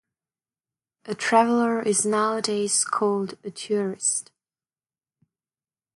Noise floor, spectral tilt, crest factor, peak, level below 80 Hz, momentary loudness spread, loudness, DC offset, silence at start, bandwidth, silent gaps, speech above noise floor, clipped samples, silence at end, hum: under -90 dBFS; -3 dB/octave; 20 dB; -6 dBFS; -76 dBFS; 9 LU; -23 LUFS; under 0.1%; 1.05 s; 11.5 kHz; none; over 67 dB; under 0.1%; 1.75 s; none